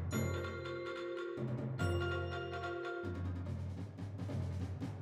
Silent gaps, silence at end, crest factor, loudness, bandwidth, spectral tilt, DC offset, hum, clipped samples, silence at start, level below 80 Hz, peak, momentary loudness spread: none; 0 s; 16 dB; -41 LUFS; 12 kHz; -6.5 dB/octave; under 0.1%; none; under 0.1%; 0 s; -58 dBFS; -24 dBFS; 6 LU